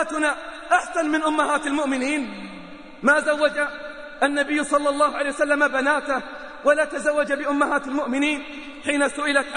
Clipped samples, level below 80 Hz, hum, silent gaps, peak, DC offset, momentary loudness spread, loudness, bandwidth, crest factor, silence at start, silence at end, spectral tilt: under 0.1%; -54 dBFS; none; none; -6 dBFS; 0.3%; 12 LU; -22 LUFS; 10 kHz; 16 dB; 0 s; 0 s; -2.5 dB/octave